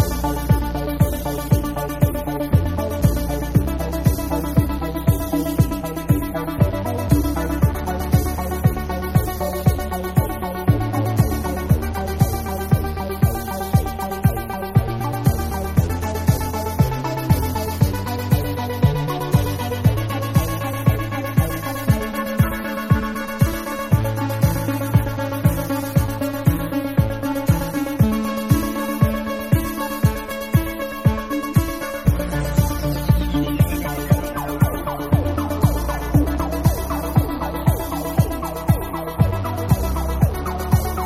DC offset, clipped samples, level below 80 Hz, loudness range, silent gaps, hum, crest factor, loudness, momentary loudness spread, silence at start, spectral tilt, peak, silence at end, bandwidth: under 0.1%; under 0.1%; -28 dBFS; 1 LU; none; none; 18 dB; -21 LUFS; 5 LU; 0 s; -6.5 dB/octave; -2 dBFS; 0 s; 16 kHz